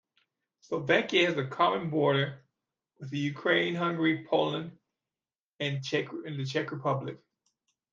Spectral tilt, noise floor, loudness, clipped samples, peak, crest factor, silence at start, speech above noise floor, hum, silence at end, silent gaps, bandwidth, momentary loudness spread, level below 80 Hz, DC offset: -6 dB/octave; under -90 dBFS; -29 LUFS; under 0.1%; -10 dBFS; 20 dB; 0.7 s; over 61 dB; none; 0.75 s; 5.39-5.53 s; 7.6 kHz; 12 LU; -76 dBFS; under 0.1%